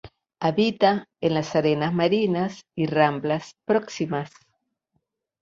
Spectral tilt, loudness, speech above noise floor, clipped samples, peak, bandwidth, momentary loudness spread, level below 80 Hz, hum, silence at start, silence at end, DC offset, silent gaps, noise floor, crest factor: -6.5 dB/octave; -24 LUFS; 52 dB; under 0.1%; -4 dBFS; 7.8 kHz; 8 LU; -62 dBFS; none; 0.05 s; 1.15 s; under 0.1%; none; -75 dBFS; 20 dB